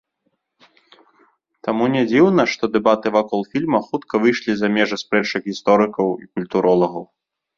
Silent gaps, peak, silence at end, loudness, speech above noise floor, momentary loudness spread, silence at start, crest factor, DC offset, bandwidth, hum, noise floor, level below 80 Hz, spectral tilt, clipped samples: none; -2 dBFS; 0.55 s; -18 LUFS; 53 dB; 8 LU; 1.65 s; 18 dB; under 0.1%; 7.4 kHz; none; -71 dBFS; -60 dBFS; -6 dB/octave; under 0.1%